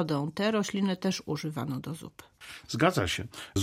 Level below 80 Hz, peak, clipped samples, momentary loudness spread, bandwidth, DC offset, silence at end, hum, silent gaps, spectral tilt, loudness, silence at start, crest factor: -58 dBFS; -10 dBFS; under 0.1%; 19 LU; 16 kHz; under 0.1%; 0 s; none; none; -5 dB/octave; -30 LUFS; 0 s; 20 dB